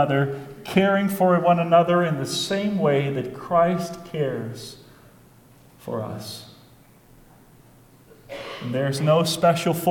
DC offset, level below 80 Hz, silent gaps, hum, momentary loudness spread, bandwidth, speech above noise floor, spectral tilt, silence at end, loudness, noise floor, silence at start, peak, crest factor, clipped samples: under 0.1%; -58 dBFS; none; none; 17 LU; 19 kHz; 30 dB; -5.5 dB/octave; 0 s; -22 LUFS; -52 dBFS; 0 s; -4 dBFS; 18 dB; under 0.1%